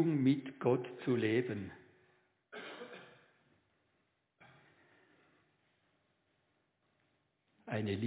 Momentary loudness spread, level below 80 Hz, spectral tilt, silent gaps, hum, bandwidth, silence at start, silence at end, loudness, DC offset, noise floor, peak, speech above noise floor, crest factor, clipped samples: 20 LU; -72 dBFS; -6.5 dB/octave; none; none; 4 kHz; 0 s; 0 s; -36 LUFS; under 0.1%; -80 dBFS; -18 dBFS; 46 dB; 22 dB; under 0.1%